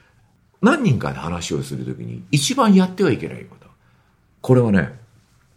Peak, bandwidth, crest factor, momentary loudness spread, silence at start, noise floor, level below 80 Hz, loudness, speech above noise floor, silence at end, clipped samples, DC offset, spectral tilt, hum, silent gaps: -2 dBFS; 14 kHz; 18 dB; 15 LU; 0.6 s; -57 dBFS; -50 dBFS; -19 LUFS; 39 dB; 0.6 s; under 0.1%; under 0.1%; -6 dB/octave; none; none